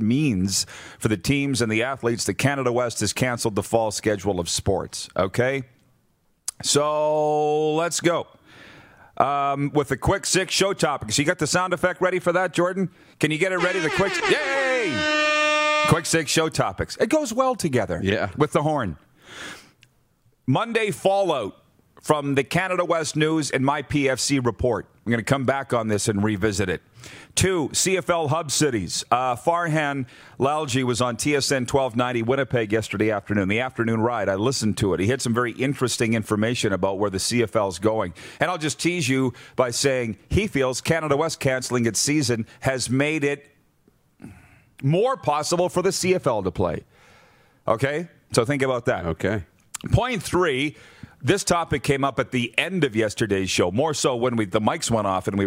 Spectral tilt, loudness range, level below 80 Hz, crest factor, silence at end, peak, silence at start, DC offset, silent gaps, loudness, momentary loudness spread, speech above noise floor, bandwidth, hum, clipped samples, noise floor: -4.5 dB/octave; 4 LU; -48 dBFS; 22 dB; 0 s; -2 dBFS; 0 s; under 0.1%; none; -23 LUFS; 6 LU; 43 dB; 16 kHz; none; under 0.1%; -65 dBFS